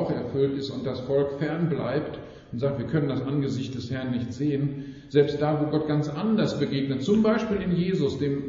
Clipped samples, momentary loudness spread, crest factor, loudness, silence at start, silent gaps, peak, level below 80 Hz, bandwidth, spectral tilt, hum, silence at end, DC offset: under 0.1%; 8 LU; 18 dB; -26 LUFS; 0 s; none; -8 dBFS; -54 dBFS; 7.4 kHz; -7 dB/octave; none; 0 s; under 0.1%